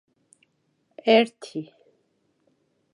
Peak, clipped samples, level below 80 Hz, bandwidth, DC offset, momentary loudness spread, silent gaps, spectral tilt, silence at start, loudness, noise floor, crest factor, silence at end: -4 dBFS; under 0.1%; -88 dBFS; 11 kHz; under 0.1%; 18 LU; none; -5 dB/octave; 1.05 s; -22 LUFS; -71 dBFS; 22 dB; 1.3 s